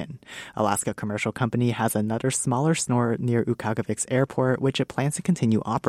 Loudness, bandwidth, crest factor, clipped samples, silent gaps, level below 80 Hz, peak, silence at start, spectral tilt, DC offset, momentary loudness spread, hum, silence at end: -25 LUFS; 15 kHz; 16 dB; under 0.1%; none; -58 dBFS; -8 dBFS; 0 s; -5.5 dB/octave; under 0.1%; 5 LU; none; 0 s